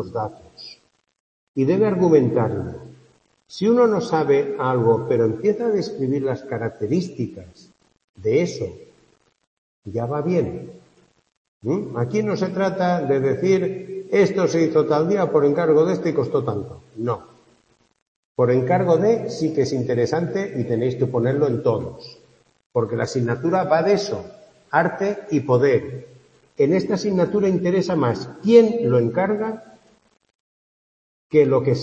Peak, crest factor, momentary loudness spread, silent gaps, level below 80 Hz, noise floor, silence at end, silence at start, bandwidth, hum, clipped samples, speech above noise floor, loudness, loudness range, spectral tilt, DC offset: -2 dBFS; 20 dB; 14 LU; 1.20-1.54 s, 8.04-8.14 s, 9.47-9.82 s, 11.37-11.61 s, 18.02-18.35 s, 22.66-22.70 s, 30.35-31.30 s; -60 dBFS; -61 dBFS; 0 s; 0 s; 8.4 kHz; none; under 0.1%; 41 dB; -20 LUFS; 7 LU; -7.5 dB/octave; under 0.1%